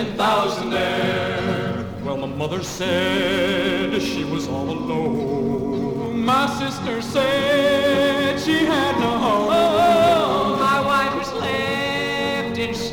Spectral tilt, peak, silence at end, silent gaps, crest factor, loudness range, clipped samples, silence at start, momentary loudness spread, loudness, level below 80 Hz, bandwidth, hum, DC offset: -5 dB/octave; -6 dBFS; 0 s; none; 14 dB; 5 LU; under 0.1%; 0 s; 8 LU; -20 LUFS; -46 dBFS; 19.5 kHz; none; under 0.1%